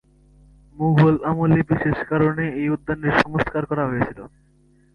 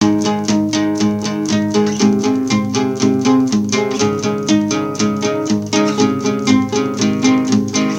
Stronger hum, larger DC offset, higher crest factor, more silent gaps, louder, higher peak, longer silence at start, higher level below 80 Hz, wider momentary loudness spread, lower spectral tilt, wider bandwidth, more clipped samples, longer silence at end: neither; neither; first, 20 dB vs 14 dB; neither; second, -20 LUFS vs -15 LUFS; about the same, -2 dBFS vs 0 dBFS; first, 0.75 s vs 0 s; first, -46 dBFS vs -52 dBFS; first, 8 LU vs 4 LU; first, -9 dB/octave vs -5 dB/octave; second, 6.6 kHz vs 15.5 kHz; neither; first, 0.65 s vs 0 s